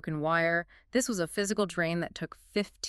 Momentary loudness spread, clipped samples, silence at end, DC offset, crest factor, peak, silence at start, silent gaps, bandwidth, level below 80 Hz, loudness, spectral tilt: 7 LU; under 0.1%; 0 s; under 0.1%; 16 dB; -14 dBFS; 0.05 s; none; 13.5 kHz; -60 dBFS; -30 LUFS; -4 dB/octave